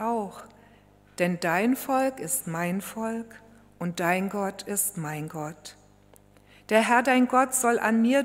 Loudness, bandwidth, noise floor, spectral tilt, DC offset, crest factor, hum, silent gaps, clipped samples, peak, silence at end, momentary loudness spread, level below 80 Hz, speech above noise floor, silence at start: -26 LUFS; 16 kHz; -56 dBFS; -4 dB/octave; under 0.1%; 22 dB; 50 Hz at -55 dBFS; none; under 0.1%; -6 dBFS; 0 s; 16 LU; -66 dBFS; 31 dB; 0 s